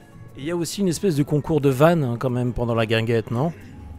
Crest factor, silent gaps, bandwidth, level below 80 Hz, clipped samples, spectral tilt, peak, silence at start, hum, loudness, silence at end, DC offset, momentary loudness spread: 20 dB; none; 16 kHz; -44 dBFS; under 0.1%; -6.5 dB/octave; -2 dBFS; 0.2 s; none; -22 LUFS; 0 s; under 0.1%; 10 LU